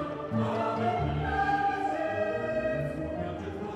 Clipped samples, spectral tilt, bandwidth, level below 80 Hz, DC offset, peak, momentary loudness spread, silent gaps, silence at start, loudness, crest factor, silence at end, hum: under 0.1%; -7.5 dB/octave; 11.5 kHz; -46 dBFS; under 0.1%; -16 dBFS; 7 LU; none; 0 s; -30 LUFS; 14 dB; 0 s; none